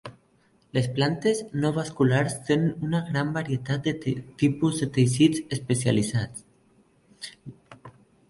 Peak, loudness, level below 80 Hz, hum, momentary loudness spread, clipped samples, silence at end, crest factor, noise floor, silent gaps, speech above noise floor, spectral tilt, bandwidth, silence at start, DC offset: -6 dBFS; -25 LUFS; -58 dBFS; none; 16 LU; under 0.1%; 0.4 s; 20 dB; -63 dBFS; none; 38 dB; -6 dB/octave; 11.5 kHz; 0.05 s; under 0.1%